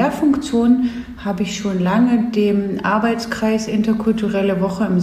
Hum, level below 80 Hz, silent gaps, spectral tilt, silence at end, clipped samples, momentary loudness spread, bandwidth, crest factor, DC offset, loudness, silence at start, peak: none; -44 dBFS; none; -6.5 dB/octave; 0 s; under 0.1%; 6 LU; 14 kHz; 14 dB; under 0.1%; -18 LUFS; 0 s; -4 dBFS